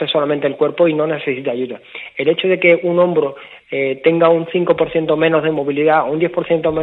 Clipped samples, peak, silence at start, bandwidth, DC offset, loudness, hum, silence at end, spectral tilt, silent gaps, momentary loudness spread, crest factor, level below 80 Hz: under 0.1%; 0 dBFS; 0 s; 4.2 kHz; under 0.1%; -16 LUFS; none; 0 s; -9 dB/octave; none; 10 LU; 16 dB; -54 dBFS